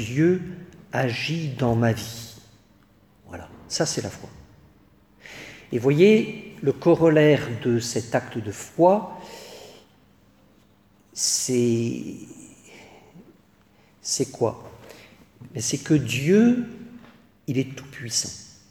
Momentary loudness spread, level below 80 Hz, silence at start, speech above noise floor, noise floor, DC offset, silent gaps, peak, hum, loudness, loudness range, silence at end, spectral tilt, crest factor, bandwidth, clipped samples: 23 LU; -58 dBFS; 0 s; 36 dB; -58 dBFS; under 0.1%; none; -4 dBFS; none; -22 LUFS; 11 LU; 0.25 s; -5 dB/octave; 20 dB; 18.5 kHz; under 0.1%